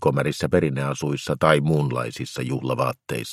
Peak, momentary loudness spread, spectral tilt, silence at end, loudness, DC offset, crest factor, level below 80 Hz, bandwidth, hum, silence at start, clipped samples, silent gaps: 0 dBFS; 9 LU; -6 dB/octave; 0 s; -23 LUFS; under 0.1%; 22 dB; -52 dBFS; 15 kHz; none; 0 s; under 0.1%; none